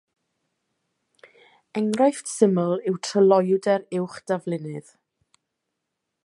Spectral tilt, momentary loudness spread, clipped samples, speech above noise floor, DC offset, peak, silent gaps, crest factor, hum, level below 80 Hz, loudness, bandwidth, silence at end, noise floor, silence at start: -6 dB/octave; 13 LU; under 0.1%; 59 dB; under 0.1%; -4 dBFS; none; 22 dB; none; -76 dBFS; -23 LUFS; 11.5 kHz; 1.45 s; -81 dBFS; 1.75 s